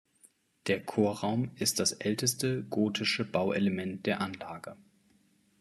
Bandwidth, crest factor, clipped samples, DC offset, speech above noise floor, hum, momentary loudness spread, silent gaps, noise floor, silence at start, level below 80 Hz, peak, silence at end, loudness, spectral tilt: 13.5 kHz; 18 dB; under 0.1%; under 0.1%; 37 dB; none; 10 LU; none; -68 dBFS; 0.65 s; -72 dBFS; -14 dBFS; 0.85 s; -31 LUFS; -4 dB/octave